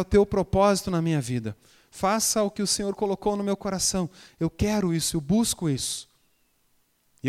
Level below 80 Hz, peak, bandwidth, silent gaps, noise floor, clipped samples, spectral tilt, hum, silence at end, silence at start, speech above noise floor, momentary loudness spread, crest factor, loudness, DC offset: -46 dBFS; -8 dBFS; 16 kHz; none; -67 dBFS; under 0.1%; -4.5 dB/octave; none; 0 s; 0 s; 42 dB; 9 LU; 18 dB; -25 LUFS; under 0.1%